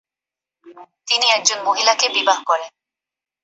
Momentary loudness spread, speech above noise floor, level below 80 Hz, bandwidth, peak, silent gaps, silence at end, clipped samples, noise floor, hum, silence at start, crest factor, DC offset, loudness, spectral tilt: 9 LU; 70 dB; -78 dBFS; 8.2 kHz; 0 dBFS; none; 0.75 s; under 0.1%; -89 dBFS; none; 0.65 s; 20 dB; under 0.1%; -16 LUFS; 2 dB/octave